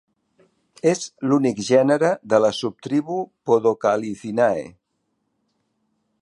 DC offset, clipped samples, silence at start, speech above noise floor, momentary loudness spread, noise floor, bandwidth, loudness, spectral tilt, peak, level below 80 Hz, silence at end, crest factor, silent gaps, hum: under 0.1%; under 0.1%; 0.85 s; 53 dB; 9 LU; -73 dBFS; 11.5 kHz; -21 LUFS; -5.5 dB/octave; -2 dBFS; -66 dBFS; 1.5 s; 20 dB; none; none